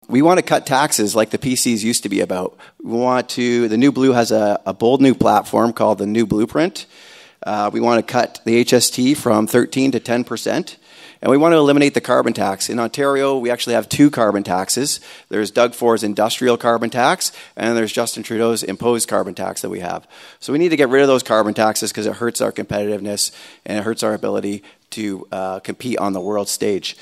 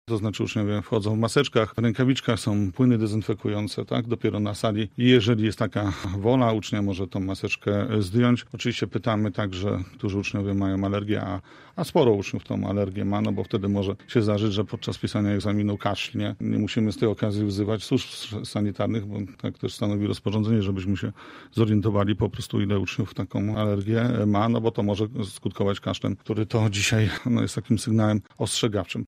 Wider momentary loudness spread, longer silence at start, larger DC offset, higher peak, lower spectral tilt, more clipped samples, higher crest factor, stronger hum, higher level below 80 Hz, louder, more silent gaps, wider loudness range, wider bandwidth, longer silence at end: first, 11 LU vs 7 LU; about the same, 0.1 s vs 0.05 s; neither; first, 0 dBFS vs -6 dBFS; second, -4 dB/octave vs -6.5 dB/octave; neither; about the same, 18 dB vs 18 dB; neither; about the same, -56 dBFS vs -54 dBFS; first, -17 LUFS vs -25 LUFS; neither; about the same, 5 LU vs 3 LU; about the same, 16 kHz vs 15 kHz; about the same, 0.1 s vs 0.05 s